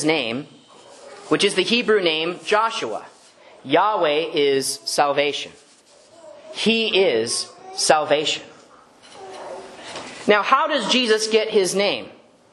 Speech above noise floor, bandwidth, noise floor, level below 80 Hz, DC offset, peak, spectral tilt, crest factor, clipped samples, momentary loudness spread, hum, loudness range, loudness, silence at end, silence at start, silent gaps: 32 dB; 12 kHz; -51 dBFS; -70 dBFS; under 0.1%; 0 dBFS; -2.5 dB/octave; 22 dB; under 0.1%; 18 LU; none; 2 LU; -20 LUFS; 0.4 s; 0 s; none